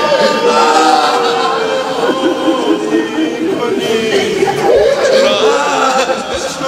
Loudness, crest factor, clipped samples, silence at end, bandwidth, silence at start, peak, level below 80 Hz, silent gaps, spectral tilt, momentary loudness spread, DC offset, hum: -12 LUFS; 12 dB; under 0.1%; 0 s; 15.5 kHz; 0 s; 0 dBFS; -46 dBFS; none; -3 dB/octave; 6 LU; under 0.1%; none